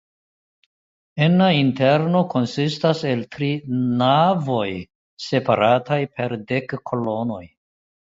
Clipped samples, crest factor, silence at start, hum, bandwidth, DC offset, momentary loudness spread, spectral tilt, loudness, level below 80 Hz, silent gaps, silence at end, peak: under 0.1%; 18 dB; 1.15 s; none; 7.8 kHz; under 0.1%; 11 LU; -7 dB/octave; -20 LUFS; -58 dBFS; 4.95-5.17 s; 0.75 s; -2 dBFS